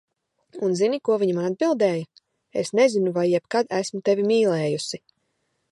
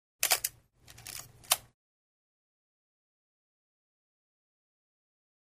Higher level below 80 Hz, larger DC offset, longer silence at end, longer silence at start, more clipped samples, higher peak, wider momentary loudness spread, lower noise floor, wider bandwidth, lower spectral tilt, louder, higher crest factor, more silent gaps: about the same, -74 dBFS vs -72 dBFS; neither; second, 0.75 s vs 3.95 s; first, 0.55 s vs 0.2 s; neither; about the same, -6 dBFS vs -8 dBFS; second, 10 LU vs 16 LU; first, -73 dBFS vs -58 dBFS; second, 11.5 kHz vs 15.5 kHz; first, -5.5 dB/octave vs 1.5 dB/octave; first, -23 LUFS vs -30 LUFS; second, 16 dB vs 32 dB; neither